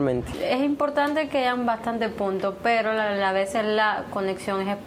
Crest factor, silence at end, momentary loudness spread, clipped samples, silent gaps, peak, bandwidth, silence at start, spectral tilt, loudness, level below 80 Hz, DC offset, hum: 14 dB; 0 s; 5 LU; under 0.1%; none; -10 dBFS; 15.5 kHz; 0 s; -5.5 dB/octave; -24 LUFS; -52 dBFS; under 0.1%; none